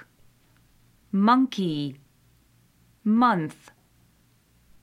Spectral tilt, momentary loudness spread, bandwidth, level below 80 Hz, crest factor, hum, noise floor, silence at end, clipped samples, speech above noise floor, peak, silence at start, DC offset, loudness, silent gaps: -7 dB/octave; 12 LU; 12 kHz; -66 dBFS; 18 dB; none; -62 dBFS; 1.3 s; under 0.1%; 40 dB; -8 dBFS; 1.15 s; under 0.1%; -24 LUFS; none